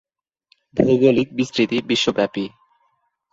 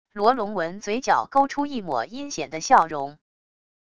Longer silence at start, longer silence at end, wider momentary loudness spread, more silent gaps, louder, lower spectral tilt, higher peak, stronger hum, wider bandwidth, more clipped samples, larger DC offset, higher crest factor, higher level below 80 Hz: first, 0.75 s vs 0.05 s; first, 0.85 s vs 0.7 s; about the same, 12 LU vs 12 LU; neither; first, -19 LUFS vs -23 LUFS; first, -5.5 dB/octave vs -3.5 dB/octave; about the same, -2 dBFS vs -2 dBFS; neither; second, 7.8 kHz vs 10 kHz; neither; second, under 0.1% vs 0.5%; about the same, 18 dB vs 22 dB; first, -54 dBFS vs -60 dBFS